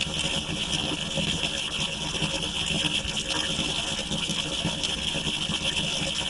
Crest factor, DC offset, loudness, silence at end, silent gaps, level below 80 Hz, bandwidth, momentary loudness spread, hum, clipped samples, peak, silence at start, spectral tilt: 18 dB; under 0.1%; -26 LUFS; 0 s; none; -44 dBFS; 11.5 kHz; 2 LU; none; under 0.1%; -10 dBFS; 0 s; -2.5 dB/octave